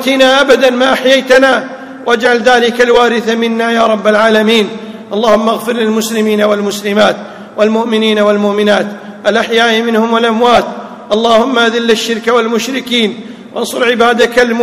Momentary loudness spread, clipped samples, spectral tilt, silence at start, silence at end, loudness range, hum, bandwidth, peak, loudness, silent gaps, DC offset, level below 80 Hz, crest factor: 9 LU; 1%; -4 dB/octave; 0 s; 0 s; 2 LU; none; 16 kHz; 0 dBFS; -10 LUFS; none; under 0.1%; -48 dBFS; 10 dB